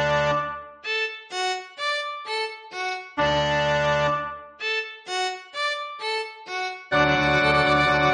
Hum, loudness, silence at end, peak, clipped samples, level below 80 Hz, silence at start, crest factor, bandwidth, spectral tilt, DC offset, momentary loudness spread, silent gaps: none; -24 LUFS; 0 s; -8 dBFS; under 0.1%; -48 dBFS; 0 s; 16 dB; 10 kHz; -4 dB/octave; under 0.1%; 11 LU; none